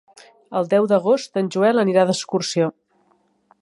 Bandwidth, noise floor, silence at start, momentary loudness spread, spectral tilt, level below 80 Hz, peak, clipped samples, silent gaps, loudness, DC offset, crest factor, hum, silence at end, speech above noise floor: 11.5 kHz; -62 dBFS; 0.5 s; 7 LU; -5 dB/octave; -72 dBFS; -4 dBFS; under 0.1%; none; -19 LUFS; under 0.1%; 16 dB; none; 0.9 s; 44 dB